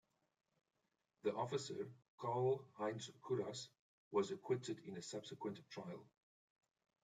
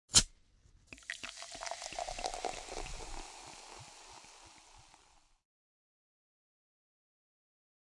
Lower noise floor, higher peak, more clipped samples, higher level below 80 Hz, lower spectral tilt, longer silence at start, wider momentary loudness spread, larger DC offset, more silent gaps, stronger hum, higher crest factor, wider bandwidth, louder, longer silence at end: first, -87 dBFS vs -67 dBFS; second, -26 dBFS vs -10 dBFS; neither; second, -88 dBFS vs -54 dBFS; first, -5.5 dB/octave vs -0.5 dB/octave; first, 1.25 s vs 0.1 s; second, 11 LU vs 16 LU; neither; first, 2.08-2.18 s, 3.79-4.11 s vs none; neither; second, 20 dB vs 32 dB; second, 9.4 kHz vs 11.5 kHz; second, -45 LUFS vs -38 LUFS; second, 1 s vs 3.1 s